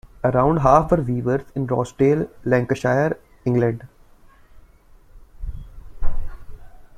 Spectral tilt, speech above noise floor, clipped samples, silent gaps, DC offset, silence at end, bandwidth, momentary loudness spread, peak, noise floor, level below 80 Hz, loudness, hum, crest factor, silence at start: -8.5 dB/octave; 30 dB; under 0.1%; none; under 0.1%; 0.15 s; 9.8 kHz; 21 LU; -2 dBFS; -49 dBFS; -32 dBFS; -20 LUFS; none; 20 dB; 0.05 s